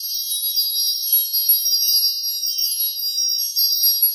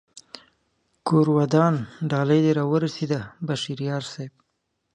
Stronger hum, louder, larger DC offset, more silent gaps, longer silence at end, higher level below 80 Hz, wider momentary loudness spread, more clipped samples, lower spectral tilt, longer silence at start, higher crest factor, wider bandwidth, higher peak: neither; first, -16 LUFS vs -23 LUFS; neither; neither; second, 0 s vs 0.65 s; second, under -90 dBFS vs -64 dBFS; second, 5 LU vs 18 LU; neither; second, 13.5 dB/octave vs -7 dB/octave; second, 0 s vs 0.15 s; about the same, 14 dB vs 18 dB; first, over 20 kHz vs 9.6 kHz; about the same, -6 dBFS vs -4 dBFS